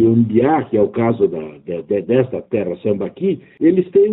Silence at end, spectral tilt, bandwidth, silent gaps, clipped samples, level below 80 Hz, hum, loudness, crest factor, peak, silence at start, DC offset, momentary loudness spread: 0 s; -8.5 dB/octave; 4 kHz; none; under 0.1%; -54 dBFS; none; -17 LUFS; 14 dB; -2 dBFS; 0 s; under 0.1%; 8 LU